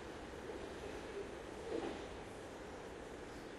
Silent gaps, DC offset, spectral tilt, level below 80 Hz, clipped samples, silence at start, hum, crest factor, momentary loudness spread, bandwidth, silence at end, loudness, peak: none; under 0.1%; -5 dB/octave; -60 dBFS; under 0.1%; 0 s; none; 18 dB; 6 LU; 12.5 kHz; 0 s; -48 LUFS; -30 dBFS